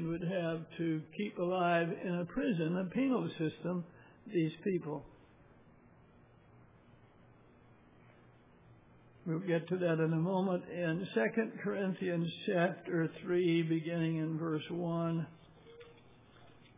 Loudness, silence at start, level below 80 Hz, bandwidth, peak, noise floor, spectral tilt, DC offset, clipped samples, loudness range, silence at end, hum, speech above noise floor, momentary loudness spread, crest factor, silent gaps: -35 LUFS; 0 s; -70 dBFS; 3.8 kHz; -20 dBFS; -62 dBFS; -6.5 dB/octave; under 0.1%; under 0.1%; 8 LU; 0.1 s; none; 28 dB; 8 LU; 16 dB; none